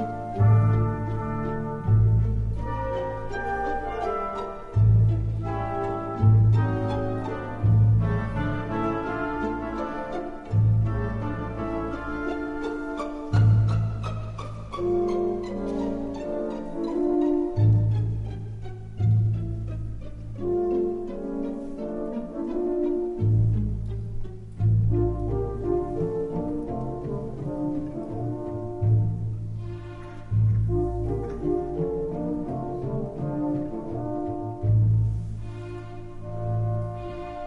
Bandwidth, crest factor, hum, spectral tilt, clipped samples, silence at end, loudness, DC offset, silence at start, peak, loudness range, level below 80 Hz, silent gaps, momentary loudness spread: 4.5 kHz; 16 dB; none; -10 dB/octave; under 0.1%; 0 s; -26 LUFS; under 0.1%; 0 s; -10 dBFS; 5 LU; -36 dBFS; none; 13 LU